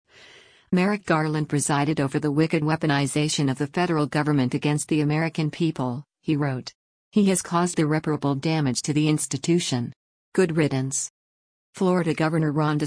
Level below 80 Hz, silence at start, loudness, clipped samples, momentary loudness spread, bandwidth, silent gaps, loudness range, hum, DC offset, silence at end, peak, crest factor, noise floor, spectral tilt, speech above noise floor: -60 dBFS; 0.7 s; -24 LUFS; under 0.1%; 5 LU; 10.5 kHz; 6.75-7.11 s, 9.96-10.32 s, 11.10-11.73 s; 2 LU; none; under 0.1%; 0 s; -8 dBFS; 14 dB; -52 dBFS; -5.5 dB/octave; 29 dB